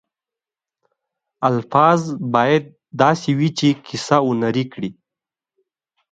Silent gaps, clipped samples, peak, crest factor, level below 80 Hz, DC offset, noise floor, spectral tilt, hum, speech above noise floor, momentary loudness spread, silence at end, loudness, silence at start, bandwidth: none; under 0.1%; 0 dBFS; 20 dB; -62 dBFS; under 0.1%; -89 dBFS; -6 dB/octave; none; 72 dB; 10 LU; 1.2 s; -18 LUFS; 1.4 s; 9.2 kHz